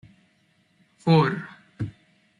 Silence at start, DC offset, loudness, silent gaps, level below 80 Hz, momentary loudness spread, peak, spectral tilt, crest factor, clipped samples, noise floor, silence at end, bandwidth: 1.05 s; under 0.1%; -24 LUFS; none; -60 dBFS; 16 LU; -8 dBFS; -8 dB/octave; 20 dB; under 0.1%; -65 dBFS; 0.5 s; 10 kHz